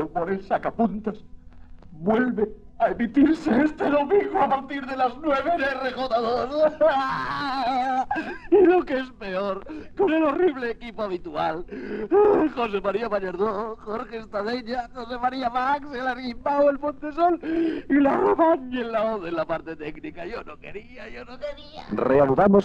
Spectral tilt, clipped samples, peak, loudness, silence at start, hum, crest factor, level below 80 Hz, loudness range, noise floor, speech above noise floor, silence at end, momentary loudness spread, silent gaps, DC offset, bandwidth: -7.5 dB/octave; under 0.1%; -6 dBFS; -24 LUFS; 0 s; none; 18 dB; -48 dBFS; 5 LU; -43 dBFS; 20 dB; 0 s; 15 LU; none; under 0.1%; 8.2 kHz